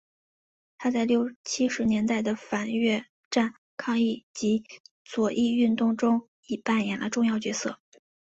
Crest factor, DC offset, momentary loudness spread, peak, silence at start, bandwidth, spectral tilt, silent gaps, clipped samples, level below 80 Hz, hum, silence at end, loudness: 16 dB; under 0.1%; 8 LU; -12 dBFS; 0.8 s; 8 kHz; -4.5 dB/octave; 1.36-1.44 s, 3.09-3.31 s, 3.58-3.77 s, 4.23-4.34 s, 4.80-4.84 s, 4.91-5.05 s, 6.28-6.43 s; under 0.1%; -64 dBFS; none; 0.6 s; -27 LUFS